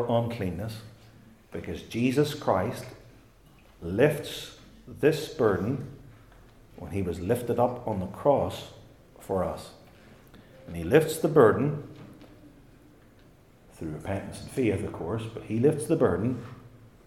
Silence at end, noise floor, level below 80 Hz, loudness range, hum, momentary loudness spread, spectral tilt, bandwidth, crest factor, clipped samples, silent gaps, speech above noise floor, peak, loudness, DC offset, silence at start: 0.2 s; -56 dBFS; -58 dBFS; 5 LU; none; 20 LU; -6.5 dB/octave; 16 kHz; 24 dB; under 0.1%; none; 29 dB; -6 dBFS; -28 LUFS; under 0.1%; 0 s